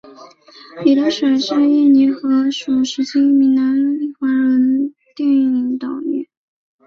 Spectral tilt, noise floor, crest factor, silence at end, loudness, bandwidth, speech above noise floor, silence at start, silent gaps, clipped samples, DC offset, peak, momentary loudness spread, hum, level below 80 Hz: -4.5 dB/octave; -42 dBFS; 14 dB; 0.65 s; -16 LUFS; 7.4 kHz; 28 dB; 0.05 s; none; under 0.1%; under 0.1%; -2 dBFS; 10 LU; none; -64 dBFS